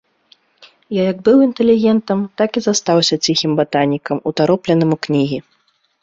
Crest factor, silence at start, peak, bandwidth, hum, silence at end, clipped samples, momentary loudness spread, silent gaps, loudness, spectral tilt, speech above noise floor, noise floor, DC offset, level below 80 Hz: 14 dB; 0.9 s; -2 dBFS; 8 kHz; none; 0.65 s; under 0.1%; 8 LU; none; -15 LUFS; -5 dB/octave; 39 dB; -54 dBFS; under 0.1%; -56 dBFS